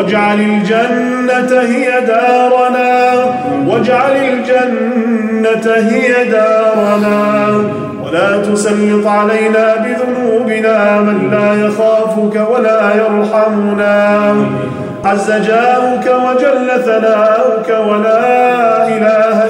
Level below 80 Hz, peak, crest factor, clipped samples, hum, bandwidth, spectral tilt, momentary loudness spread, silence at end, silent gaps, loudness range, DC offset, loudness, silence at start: -56 dBFS; 0 dBFS; 10 dB; under 0.1%; none; 16 kHz; -6 dB/octave; 4 LU; 0 s; none; 1 LU; under 0.1%; -11 LUFS; 0 s